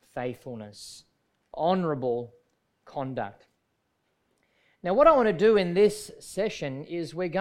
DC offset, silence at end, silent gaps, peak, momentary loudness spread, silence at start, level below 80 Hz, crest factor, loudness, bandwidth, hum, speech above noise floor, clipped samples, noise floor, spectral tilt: under 0.1%; 0 s; none; -6 dBFS; 20 LU; 0.15 s; -58 dBFS; 22 dB; -26 LUFS; 14.5 kHz; none; 50 dB; under 0.1%; -75 dBFS; -6 dB/octave